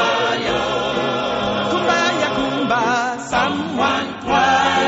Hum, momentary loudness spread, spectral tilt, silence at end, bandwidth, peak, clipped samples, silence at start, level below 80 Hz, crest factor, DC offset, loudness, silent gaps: none; 5 LU; -2 dB/octave; 0 s; 8 kHz; -4 dBFS; under 0.1%; 0 s; -46 dBFS; 14 dB; under 0.1%; -18 LUFS; none